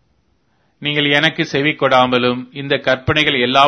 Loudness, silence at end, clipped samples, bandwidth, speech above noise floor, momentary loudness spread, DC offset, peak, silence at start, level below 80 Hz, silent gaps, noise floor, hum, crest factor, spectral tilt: -15 LUFS; 0 s; under 0.1%; 11 kHz; 46 dB; 7 LU; under 0.1%; 0 dBFS; 0.8 s; -48 dBFS; none; -61 dBFS; none; 16 dB; -5 dB/octave